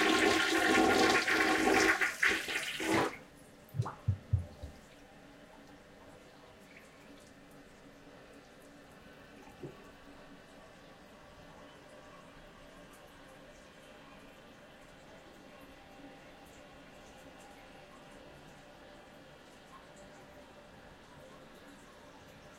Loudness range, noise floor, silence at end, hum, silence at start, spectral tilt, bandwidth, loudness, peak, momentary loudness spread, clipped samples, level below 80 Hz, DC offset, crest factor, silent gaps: 25 LU; -57 dBFS; 0.1 s; none; 0 s; -3.5 dB/octave; 16 kHz; -30 LUFS; -14 dBFS; 28 LU; under 0.1%; -60 dBFS; under 0.1%; 24 dB; none